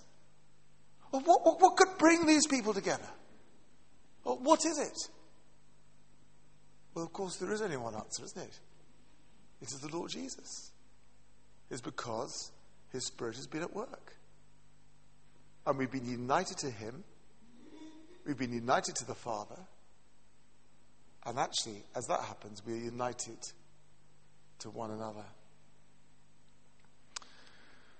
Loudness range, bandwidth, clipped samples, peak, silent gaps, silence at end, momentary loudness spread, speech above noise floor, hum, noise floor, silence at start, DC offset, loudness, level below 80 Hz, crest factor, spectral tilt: 17 LU; 8.8 kHz; under 0.1%; -10 dBFS; none; 2.7 s; 22 LU; 34 dB; 50 Hz at -70 dBFS; -68 dBFS; 1.15 s; 0.2%; -34 LUFS; -70 dBFS; 28 dB; -3.5 dB/octave